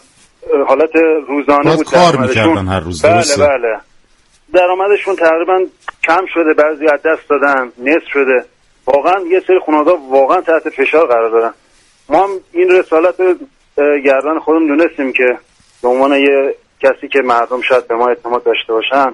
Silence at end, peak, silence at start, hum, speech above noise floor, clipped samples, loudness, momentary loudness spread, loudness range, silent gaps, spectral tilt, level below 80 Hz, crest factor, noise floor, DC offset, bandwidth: 0 s; 0 dBFS; 0.45 s; none; 39 dB; under 0.1%; -12 LUFS; 5 LU; 2 LU; none; -5 dB/octave; -48 dBFS; 12 dB; -50 dBFS; under 0.1%; 11.5 kHz